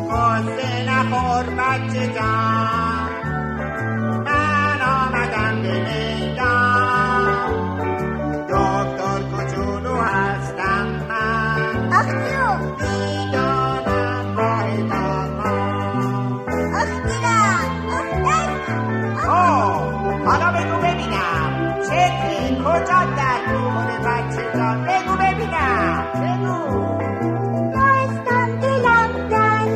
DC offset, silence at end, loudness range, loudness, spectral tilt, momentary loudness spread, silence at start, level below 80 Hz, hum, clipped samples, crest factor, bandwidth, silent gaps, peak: under 0.1%; 0 s; 2 LU; -19 LUFS; -6 dB/octave; 7 LU; 0 s; -40 dBFS; none; under 0.1%; 14 dB; 14 kHz; none; -4 dBFS